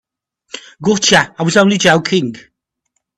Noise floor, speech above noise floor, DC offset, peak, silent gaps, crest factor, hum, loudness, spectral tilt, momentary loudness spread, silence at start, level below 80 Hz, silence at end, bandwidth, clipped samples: -70 dBFS; 58 dB; under 0.1%; 0 dBFS; none; 16 dB; none; -12 LUFS; -3.5 dB/octave; 21 LU; 0.55 s; -54 dBFS; 0.8 s; 12.5 kHz; under 0.1%